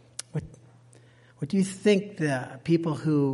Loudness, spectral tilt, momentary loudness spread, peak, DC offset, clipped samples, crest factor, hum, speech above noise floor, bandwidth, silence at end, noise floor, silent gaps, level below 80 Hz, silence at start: -27 LUFS; -6.5 dB/octave; 12 LU; -10 dBFS; under 0.1%; under 0.1%; 18 dB; none; 30 dB; 11.5 kHz; 0 s; -55 dBFS; none; -64 dBFS; 0.35 s